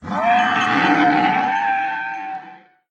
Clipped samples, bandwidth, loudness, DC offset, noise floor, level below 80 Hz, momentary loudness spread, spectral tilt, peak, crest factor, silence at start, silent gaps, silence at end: under 0.1%; 8.8 kHz; -17 LUFS; under 0.1%; -43 dBFS; -60 dBFS; 13 LU; -5 dB/octave; -4 dBFS; 14 dB; 0 s; none; 0.35 s